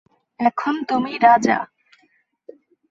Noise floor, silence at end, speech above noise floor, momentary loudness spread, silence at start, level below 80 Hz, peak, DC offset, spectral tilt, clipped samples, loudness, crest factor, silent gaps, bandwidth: -63 dBFS; 1.25 s; 45 dB; 9 LU; 0.4 s; -66 dBFS; -2 dBFS; under 0.1%; -5 dB/octave; under 0.1%; -18 LUFS; 18 dB; none; 7.8 kHz